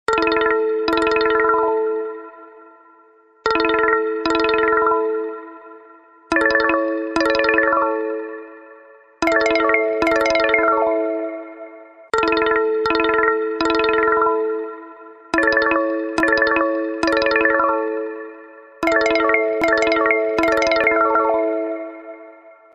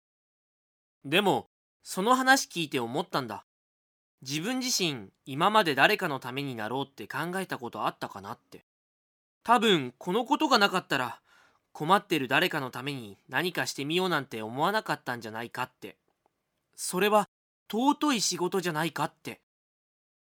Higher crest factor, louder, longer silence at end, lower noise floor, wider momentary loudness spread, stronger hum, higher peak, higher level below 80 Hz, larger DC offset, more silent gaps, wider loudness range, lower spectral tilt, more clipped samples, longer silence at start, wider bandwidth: second, 16 dB vs 24 dB; first, -18 LUFS vs -28 LUFS; second, 0.25 s vs 0.95 s; second, -52 dBFS vs -76 dBFS; second, 13 LU vs 17 LU; neither; first, -2 dBFS vs -6 dBFS; first, -50 dBFS vs -80 dBFS; neither; second, none vs 1.46-1.80 s, 3.43-4.18 s, 8.63-9.41 s, 17.28-17.66 s; about the same, 2 LU vs 4 LU; about the same, -4 dB/octave vs -3.5 dB/octave; neither; second, 0.1 s vs 1.05 s; second, 11.5 kHz vs over 20 kHz